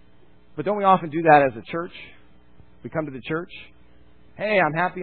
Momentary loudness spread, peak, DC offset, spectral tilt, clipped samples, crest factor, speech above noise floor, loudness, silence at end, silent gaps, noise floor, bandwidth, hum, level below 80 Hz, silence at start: 23 LU; 0 dBFS; 0.4%; -10.5 dB/octave; under 0.1%; 22 dB; 34 dB; -22 LUFS; 0 s; none; -56 dBFS; 4.5 kHz; 60 Hz at -60 dBFS; -58 dBFS; 0.55 s